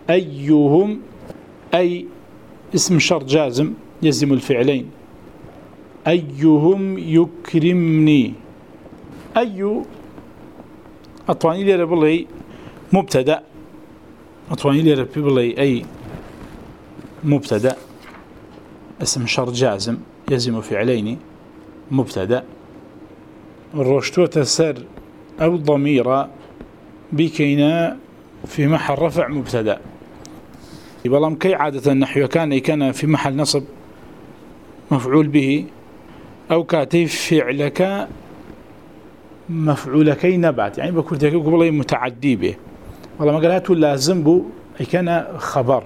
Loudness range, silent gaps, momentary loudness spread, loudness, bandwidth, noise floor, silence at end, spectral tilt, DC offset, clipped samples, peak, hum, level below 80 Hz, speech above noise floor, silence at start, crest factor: 5 LU; none; 17 LU; -18 LUFS; 15.5 kHz; -43 dBFS; 0 s; -6 dB/octave; 0.2%; under 0.1%; 0 dBFS; none; -52 dBFS; 26 dB; 0.05 s; 18 dB